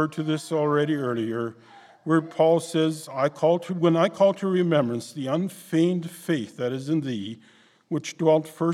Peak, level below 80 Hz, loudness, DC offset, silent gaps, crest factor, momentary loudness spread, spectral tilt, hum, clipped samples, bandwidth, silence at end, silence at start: -6 dBFS; -76 dBFS; -24 LUFS; under 0.1%; none; 18 dB; 10 LU; -6.5 dB/octave; none; under 0.1%; 14 kHz; 0 s; 0 s